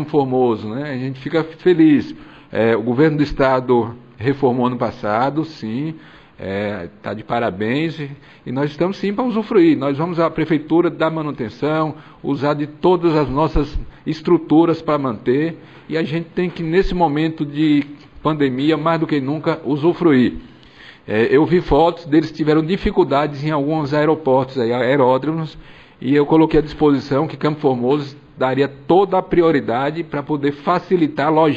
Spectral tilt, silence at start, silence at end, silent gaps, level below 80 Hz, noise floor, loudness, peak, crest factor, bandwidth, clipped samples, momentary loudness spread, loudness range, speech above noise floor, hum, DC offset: -8.5 dB/octave; 0 s; 0 s; none; -38 dBFS; -43 dBFS; -18 LUFS; -2 dBFS; 14 dB; 7.6 kHz; under 0.1%; 11 LU; 4 LU; 26 dB; none; 0.1%